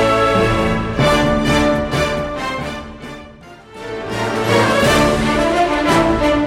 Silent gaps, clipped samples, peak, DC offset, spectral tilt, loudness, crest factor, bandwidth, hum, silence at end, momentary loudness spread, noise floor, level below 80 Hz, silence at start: none; under 0.1%; -2 dBFS; under 0.1%; -5 dB/octave; -15 LUFS; 14 dB; 16.5 kHz; none; 0 s; 16 LU; -39 dBFS; -30 dBFS; 0 s